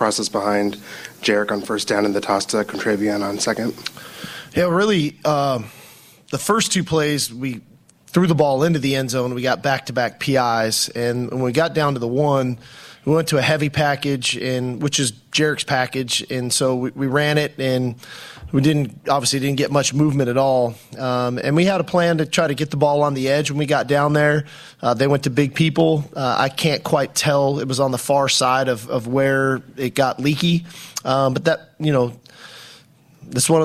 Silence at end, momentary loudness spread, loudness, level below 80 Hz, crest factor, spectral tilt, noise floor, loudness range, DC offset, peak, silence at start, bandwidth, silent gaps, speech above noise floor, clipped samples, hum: 0 s; 8 LU; -19 LUFS; -54 dBFS; 16 dB; -4.5 dB/octave; -49 dBFS; 3 LU; under 0.1%; -2 dBFS; 0 s; 15.5 kHz; none; 30 dB; under 0.1%; none